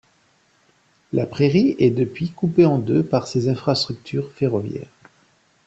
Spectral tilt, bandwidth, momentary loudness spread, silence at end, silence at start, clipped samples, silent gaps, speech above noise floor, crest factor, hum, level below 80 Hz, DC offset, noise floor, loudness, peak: -7.5 dB/octave; 8.2 kHz; 10 LU; 0.8 s; 1.15 s; under 0.1%; none; 41 dB; 18 dB; none; -56 dBFS; under 0.1%; -60 dBFS; -20 LUFS; -2 dBFS